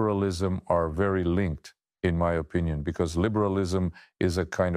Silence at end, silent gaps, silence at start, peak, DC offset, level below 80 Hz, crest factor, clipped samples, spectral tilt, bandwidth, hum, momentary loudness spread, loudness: 0 s; none; 0 s; -12 dBFS; under 0.1%; -42 dBFS; 16 dB; under 0.1%; -7 dB/octave; 12.5 kHz; none; 5 LU; -27 LUFS